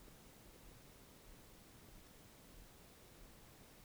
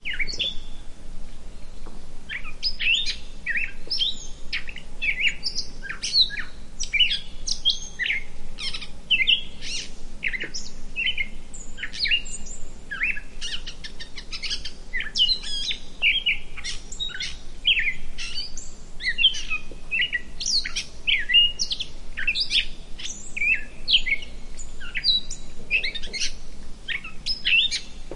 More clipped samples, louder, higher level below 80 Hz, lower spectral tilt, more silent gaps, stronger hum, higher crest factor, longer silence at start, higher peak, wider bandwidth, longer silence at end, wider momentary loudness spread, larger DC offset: neither; second, -61 LUFS vs -24 LUFS; second, -66 dBFS vs -36 dBFS; first, -3.5 dB/octave vs 0 dB/octave; neither; neither; about the same, 16 dB vs 18 dB; about the same, 0 s vs 0 s; second, -46 dBFS vs -6 dBFS; first, over 20 kHz vs 11 kHz; about the same, 0 s vs 0 s; second, 0 LU vs 19 LU; neither